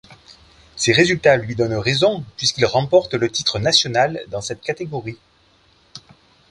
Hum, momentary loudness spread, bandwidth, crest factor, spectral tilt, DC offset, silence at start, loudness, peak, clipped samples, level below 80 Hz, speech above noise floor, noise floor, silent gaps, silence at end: none; 13 LU; 11.5 kHz; 20 dB; -4 dB/octave; under 0.1%; 0.1 s; -18 LUFS; 0 dBFS; under 0.1%; -50 dBFS; 38 dB; -56 dBFS; none; 0.5 s